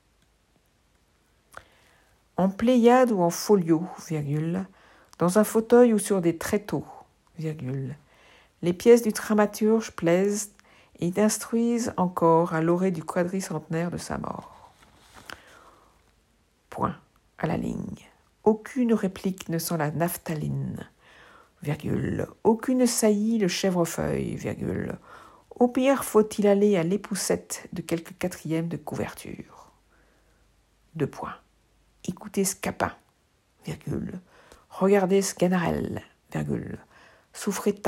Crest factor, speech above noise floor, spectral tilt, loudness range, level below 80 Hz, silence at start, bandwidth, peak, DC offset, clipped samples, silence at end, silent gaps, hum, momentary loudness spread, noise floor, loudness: 20 dB; 42 dB; -5.5 dB/octave; 11 LU; -58 dBFS; 2.4 s; 16 kHz; -6 dBFS; under 0.1%; under 0.1%; 0 s; none; none; 18 LU; -66 dBFS; -25 LUFS